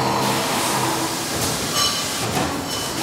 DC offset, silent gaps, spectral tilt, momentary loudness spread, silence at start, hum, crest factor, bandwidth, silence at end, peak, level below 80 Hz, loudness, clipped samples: under 0.1%; none; -2.5 dB/octave; 4 LU; 0 s; none; 16 dB; 16 kHz; 0 s; -6 dBFS; -48 dBFS; -20 LUFS; under 0.1%